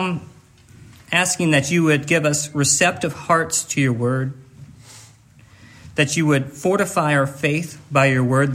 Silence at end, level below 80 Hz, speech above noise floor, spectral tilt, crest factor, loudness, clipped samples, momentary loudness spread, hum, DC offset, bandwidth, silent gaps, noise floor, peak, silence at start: 0 s; -58 dBFS; 30 dB; -4.5 dB/octave; 18 dB; -19 LUFS; under 0.1%; 8 LU; none; under 0.1%; 16 kHz; none; -49 dBFS; -2 dBFS; 0 s